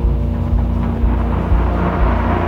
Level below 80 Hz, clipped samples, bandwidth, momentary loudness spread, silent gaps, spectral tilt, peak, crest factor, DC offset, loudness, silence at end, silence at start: -18 dBFS; under 0.1%; 4.5 kHz; 2 LU; none; -9.5 dB/octave; -4 dBFS; 12 dB; under 0.1%; -17 LUFS; 0 s; 0 s